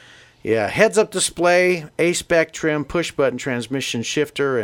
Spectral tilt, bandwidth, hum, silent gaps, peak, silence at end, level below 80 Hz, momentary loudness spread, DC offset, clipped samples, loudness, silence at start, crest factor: -4 dB/octave; 17 kHz; none; none; 0 dBFS; 0 s; -50 dBFS; 7 LU; under 0.1%; under 0.1%; -19 LUFS; 0.45 s; 20 dB